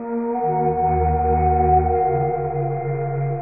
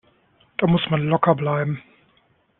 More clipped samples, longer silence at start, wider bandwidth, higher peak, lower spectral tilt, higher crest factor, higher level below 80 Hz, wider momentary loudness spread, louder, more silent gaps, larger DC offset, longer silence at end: neither; second, 0 s vs 0.6 s; second, 2.7 kHz vs 4.1 kHz; second, -6 dBFS vs -2 dBFS; second, -6 dB/octave vs -10.5 dB/octave; second, 14 dB vs 20 dB; first, -30 dBFS vs -58 dBFS; second, 7 LU vs 11 LU; about the same, -20 LUFS vs -21 LUFS; neither; first, 0.4% vs under 0.1%; second, 0 s vs 0.8 s